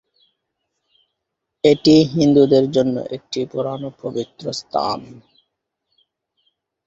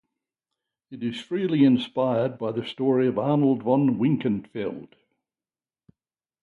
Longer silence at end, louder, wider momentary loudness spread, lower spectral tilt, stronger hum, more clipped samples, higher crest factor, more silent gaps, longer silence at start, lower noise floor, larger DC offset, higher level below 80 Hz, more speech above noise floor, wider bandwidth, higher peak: first, 1.75 s vs 1.55 s; first, -18 LUFS vs -24 LUFS; about the same, 14 LU vs 12 LU; second, -6.5 dB/octave vs -8.5 dB/octave; neither; neither; about the same, 18 dB vs 18 dB; neither; first, 1.65 s vs 0.9 s; second, -79 dBFS vs under -90 dBFS; neither; first, -56 dBFS vs -66 dBFS; second, 62 dB vs over 67 dB; about the same, 7.8 kHz vs 7.2 kHz; first, -2 dBFS vs -8 dBFS